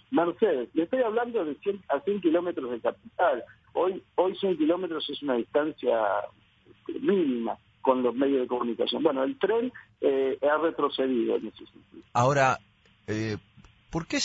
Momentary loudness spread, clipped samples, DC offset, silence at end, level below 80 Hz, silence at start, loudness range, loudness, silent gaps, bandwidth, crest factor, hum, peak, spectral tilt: 9 LU; under 0.1%; under 0.1%; 0 s; -62 dBFS; 0.1 s; 2 LU; -27 LUFS; none; 8 kHz; 18 dB; none; -10 dBFS; -5.5 dB/octave